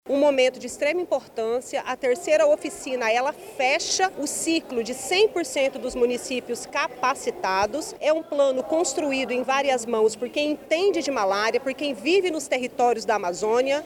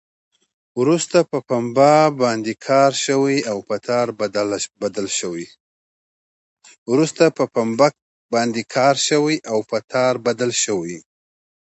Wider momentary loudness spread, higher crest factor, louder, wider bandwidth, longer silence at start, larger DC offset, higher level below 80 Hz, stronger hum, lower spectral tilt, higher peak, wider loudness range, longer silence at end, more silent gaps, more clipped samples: second, 6 LU vs 9 LU; about the same, 16 dB vs 18 dB; second, -24 LUFS vs -18 LUFS; first, 18 kHz vs 8.2 kHz; second, 0.05 s vs 0.75 s; neither; first, -60 dBFS vs -66 dBFS; neither; second, -2 dB/octave vs -4 dB/octave; second, -8 dBFS vs 0 dBFS; second, 1 LU vs 6 LU; second, 0 s vs 0.8 s; second, none vs 5.60-6.57 s, 6.78-6.86 s, 8.02-8.29 s, 9.84-9.88 s; neither